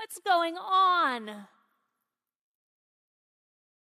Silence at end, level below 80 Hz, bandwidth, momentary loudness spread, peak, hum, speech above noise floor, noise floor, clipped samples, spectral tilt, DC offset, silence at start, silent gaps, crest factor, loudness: 2.55 s; under -90 dBFS; 15 kHz; 18 LU; -14 dBFS; none; 59 dB; -86 dBFS; under 0.1%; -2 dB/octave; under 0.1%; 0 s; none; 18 dB; -26 LUFS